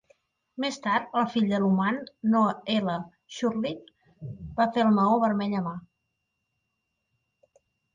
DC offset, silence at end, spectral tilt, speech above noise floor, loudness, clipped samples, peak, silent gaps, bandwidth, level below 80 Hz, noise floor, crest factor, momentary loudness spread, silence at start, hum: under 0.1%; 2.15 s; -6.5 dB/octave; 54 dB; -26 LUFS; under 0.1%; -12 dBFS; none; 7.6 kHz; -62 dBFS; -80 dBFS; 16 dB; 19 LU; 0.6 s; none